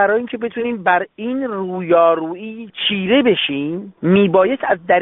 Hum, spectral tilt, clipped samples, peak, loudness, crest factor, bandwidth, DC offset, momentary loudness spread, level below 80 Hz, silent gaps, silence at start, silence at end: none; -3.5 dB/octave; under 0.1%; -2 dBFS; -17 LUFS; 16 dB; 4 kHz; under 0.1%; 10 LU; -58 dBFS; none; 0 s; 0 s